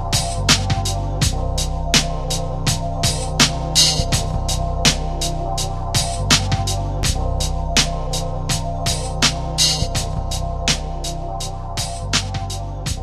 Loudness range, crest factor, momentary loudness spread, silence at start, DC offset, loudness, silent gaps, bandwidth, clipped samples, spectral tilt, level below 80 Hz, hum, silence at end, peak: 3 LU; 18 dB; 9 LU; 0 s; under 0.1%; -19 LUFS; none; 14 kHz; under 0.1%; -3 dB/octave; -26 dBFS; none; 0 s; 0 dBFS